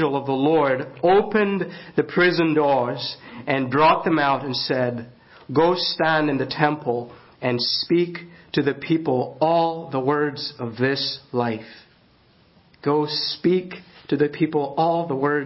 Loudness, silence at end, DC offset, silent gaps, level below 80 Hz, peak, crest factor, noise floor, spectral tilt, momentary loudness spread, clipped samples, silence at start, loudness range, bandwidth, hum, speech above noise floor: -22 LUFS; 0 s; under 0.1%; none; -60 dBFS; -2 dBFS; 20 dB; -56 dBFS; -9 dB/octave; 10 LU; under 0.1%; 0 s; 5 LU; 5.8 kHz; none; 35 dB